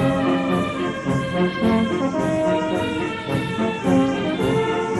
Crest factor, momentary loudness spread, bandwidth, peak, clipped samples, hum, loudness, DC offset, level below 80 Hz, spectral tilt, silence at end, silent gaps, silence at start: 14 dB; 5 LU; 12 kHz; -6 dBFS; under 0.1%; none; -21 LUFS; under 0.1%; -46 dBFS; -6.5 dB/octave; 0 s; none; 0 s